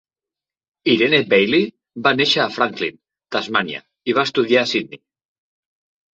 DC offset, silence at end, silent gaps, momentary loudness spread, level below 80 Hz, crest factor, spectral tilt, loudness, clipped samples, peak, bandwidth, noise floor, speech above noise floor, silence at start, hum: under 0.1%; 1.15 s; none; 12 LU; -64 dBFS; 18 dB; -4.5 dB/octave; -18 LUFS; under 0.1%; -2 dBFS; 7.8 kHz; -89 dBFS; 71 dB; 0.85 s; none